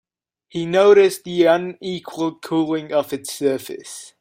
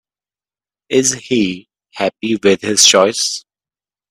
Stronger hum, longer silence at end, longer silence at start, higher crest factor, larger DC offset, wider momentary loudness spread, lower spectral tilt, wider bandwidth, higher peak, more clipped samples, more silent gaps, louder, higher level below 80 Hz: neither; second, 0.15 s vs 0.7 s; second, 0.55 s vs 0.9 s; about the same, 16 dB vs 16 dB; neither; first, 17 LU vs 12 LU; first, -5 dB/octave vs -2 dB/octave; about the same, 16 kHz vs 16 kHz; about the same, -2 dBFS vs 0 dBFS; neither; neither; second, -19 LUFS vs -13 LUFS; second, -64 dBFS vs -58 dBFS